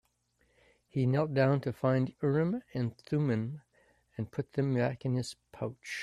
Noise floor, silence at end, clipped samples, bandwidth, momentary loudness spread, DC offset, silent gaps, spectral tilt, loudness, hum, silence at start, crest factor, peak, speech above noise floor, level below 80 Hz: -73 dBFS; 0 s; under 0.1%; 11.5 kHz; 12 LU; under 0.1%; none; -7.5 dB/octave; -32 LUFS; none; 0.95 s; 18 dB; -14 dBFS; 42 dB; -68 dBFS